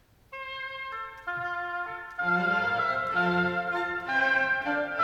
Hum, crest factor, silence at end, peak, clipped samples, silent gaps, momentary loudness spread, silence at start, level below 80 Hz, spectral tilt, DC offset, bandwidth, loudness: none; 14 dB; 0 s; -14 dBFS; under 0.1%; none; 12 LU; 0.3 s; -62 dBFS; -6 dB/octave; under 0.1%; 14.5 kHz; -28 LUFS